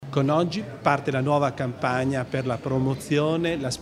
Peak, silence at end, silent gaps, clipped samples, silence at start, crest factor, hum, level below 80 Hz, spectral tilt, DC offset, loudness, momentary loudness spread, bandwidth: -4 dBFS; 0 s; none; under 0.1%; 0 s; 20 dB; none; -54 dBFS; -6.5 dB/octave; under 0.1%; -25 LUFS; 5 LU; 13.5 kHz